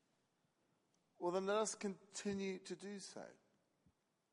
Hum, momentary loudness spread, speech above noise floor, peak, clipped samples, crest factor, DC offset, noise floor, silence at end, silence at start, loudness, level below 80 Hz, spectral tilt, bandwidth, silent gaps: none; 14 LU; 39 dB; -26 dBFS; under 0.1%; 20 dB; under 0.1%; -83 dBFS; 1 s; 1.2 s; -44 LUFS; -88 dBFS; -4 dB/octave; 11.5 kHz; none